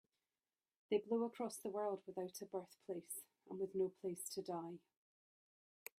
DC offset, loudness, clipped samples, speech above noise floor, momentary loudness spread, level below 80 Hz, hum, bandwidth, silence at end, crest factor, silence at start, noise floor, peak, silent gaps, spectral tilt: under 0.1%; -45 LUFS; under 0.1%; over 45 dB; 10 LU; under -90 dBFS; none; 16 kHz; 1.2 s; 20 dB; 0.9 s; under -90 dBFS; -28 dBFS; none; -5 dB/octave